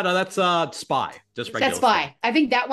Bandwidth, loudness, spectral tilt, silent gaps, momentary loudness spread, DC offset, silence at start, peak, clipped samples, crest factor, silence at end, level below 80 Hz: 12.5 kHz; -22 LUFS; -4 dB/octave; none; 10 LU; under 0.1%; 0 s; -6 dBFS; under 0.1%; 16 dB; 0 s; -64 dBFS